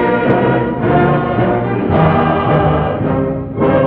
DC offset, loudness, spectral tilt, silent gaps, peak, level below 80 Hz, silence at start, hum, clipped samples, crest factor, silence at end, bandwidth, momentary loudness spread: under 0.1%; -14 LUFS; -11.5 dB/octave; none; 0 dBFS; -32 dBFS; 0 s; none; under 0.1%; 12 dB; 0 s; 4.6 kHz; 4 LU